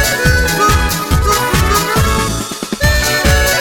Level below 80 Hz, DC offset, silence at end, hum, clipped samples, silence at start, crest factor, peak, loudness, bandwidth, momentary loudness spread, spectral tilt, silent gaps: -18 dBFS; under 0.1%; 0 s; none; under 0.1%; 0 s; 12 dB; 0 dBFS; -13 LUFS; over 20 kHz; 4 LU; -3.5 dB/octave; none